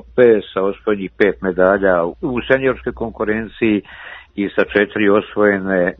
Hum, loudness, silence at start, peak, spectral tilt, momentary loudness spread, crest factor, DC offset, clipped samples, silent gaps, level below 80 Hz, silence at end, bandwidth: none; -17 LUFS; 0.15 s; 0 dBFS; -9 dB/octave; 10 LU; 16 dB; under 0.1%; under 0.1%; none; -44 dBFS; 0.05 s; 5.2 kHz